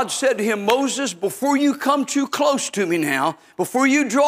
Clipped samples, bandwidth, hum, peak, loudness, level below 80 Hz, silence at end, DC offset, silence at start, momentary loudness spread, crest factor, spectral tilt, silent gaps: under 0.1%; 16 kHz; none; -2 dBFS; -20 LUFS; -72 dBFS; 0 s; under 0.1%; 0 s; 6 LU; 16 dB; -3.5 dB/octave; none